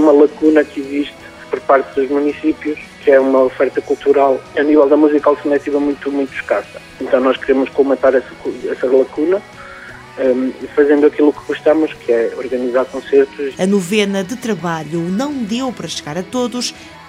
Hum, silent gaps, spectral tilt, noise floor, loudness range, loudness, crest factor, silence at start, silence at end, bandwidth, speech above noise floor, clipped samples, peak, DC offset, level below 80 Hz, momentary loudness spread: none; none; -5.5 dB/octave; -34 dBFS; 4 LU; -15 LUFS; 14 dB; 0 s; 0 s; 14.5 kHz; 19 dB; under 0.1%; 0 dBFS; under 0.1%; -52 dBFS; 11 LU